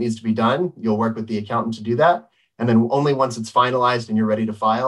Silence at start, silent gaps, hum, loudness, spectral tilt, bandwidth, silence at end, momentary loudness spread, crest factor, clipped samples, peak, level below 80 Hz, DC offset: 0 s; none; none; -20 LUFS; -6.5 dB/octave; 11 kHz; 0 s; 6 LU; 16 dB; under 0.1%; -4 dBFS; -66 dBFS; under 0.1%